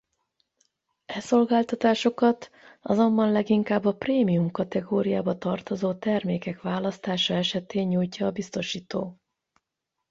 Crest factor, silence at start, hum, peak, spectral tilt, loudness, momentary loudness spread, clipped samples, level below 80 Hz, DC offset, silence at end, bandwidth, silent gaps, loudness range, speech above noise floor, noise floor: 18 dB; 1.1 s; none; -8 dBFS; -6 dB/octave; -25 LUFS; 9 LU; under 0.1%; -64 dBFS; under 0.1%; 1 s; 8 kHz; none; 5 LU; 59 dB; -84 dBFS